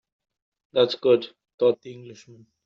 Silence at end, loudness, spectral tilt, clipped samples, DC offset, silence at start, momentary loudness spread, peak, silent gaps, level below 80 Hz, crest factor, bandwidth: 0.5 s; -23 LUFS; -4 dB/octave; under 0.1%; under 0.1%; 0.75 s; 20 LU; -6 dBFS; 1.54-1.58 s; -74 dBFS; 20 dB; 7 kHz